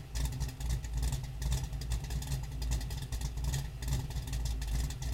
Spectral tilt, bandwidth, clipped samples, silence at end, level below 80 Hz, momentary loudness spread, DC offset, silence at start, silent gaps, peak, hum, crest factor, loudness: -4.5 dB/octave; 16.5 kHz; under 0.1%; 0 s; -36 dBFS; 2 LU; under 0.1%; 0 s; none; -20 dBFS; none; 14 dB; -38 LUFS